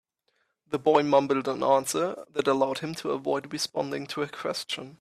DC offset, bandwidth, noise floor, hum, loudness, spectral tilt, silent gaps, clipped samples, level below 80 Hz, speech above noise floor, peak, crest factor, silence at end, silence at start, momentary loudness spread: under 0.1%; 14.5 kHz; -74 dBFS; none; -27 LUFS; -4 dB/octave; none; under 0.1%; -72 dBFS; 47 dB; -8 dBFS; 20 dB; 0.05 s; 0.7 s; 9 LU